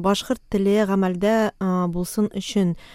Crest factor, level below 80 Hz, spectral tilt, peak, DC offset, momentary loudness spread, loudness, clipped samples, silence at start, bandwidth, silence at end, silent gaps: 14 dB; -46 dBFS; -6 dB/octave; -6 dBFS; under 0.1%; 5 LU; -22 LUFS; under 0.1%; 0 s; 16 kHz; 0 s; none